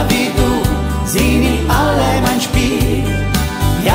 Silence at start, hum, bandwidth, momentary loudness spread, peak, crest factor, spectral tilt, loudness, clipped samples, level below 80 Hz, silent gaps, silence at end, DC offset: 0 s; none; 16.5 kHz; 4 LU; 0 dBFS; 12 dB; -5 dB/octave; -14 LUFS; under 0.1%; -20 dBFS; none; 0 s; under 0.1%